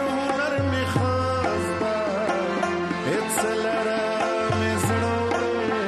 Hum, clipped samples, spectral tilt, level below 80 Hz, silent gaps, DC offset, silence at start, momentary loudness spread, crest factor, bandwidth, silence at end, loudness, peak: none; under 0.1%; -5 dB/octave; -52 dBFS; none; under 0.1%; 0 s; 2 LU; 14 dB; 13 kHz; 0 s; -24 LUFS; -10 dBFS